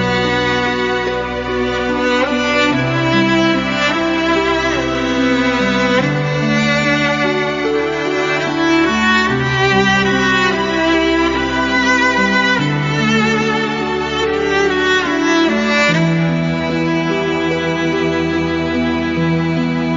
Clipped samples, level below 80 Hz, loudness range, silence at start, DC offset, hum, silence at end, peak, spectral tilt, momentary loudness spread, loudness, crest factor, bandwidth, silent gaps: under 0.1%; -38 dBFS; 2 LU; 0 s; under 0.1%; none; 0 s; -2 dBFS; -3.5 dB/octave; 4 LU; -15 LUFS; 14 dB; 7.6 kHz; none